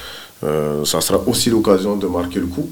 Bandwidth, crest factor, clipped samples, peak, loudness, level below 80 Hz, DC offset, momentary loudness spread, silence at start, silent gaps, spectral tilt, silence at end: 18 kHz; 18 dB; under 0.1%; 0 dBFS; -18 LUFS; -44 dBFS; under 0.1%; 7 LU; 0 s; none; -4.5 dB/octave; 0 s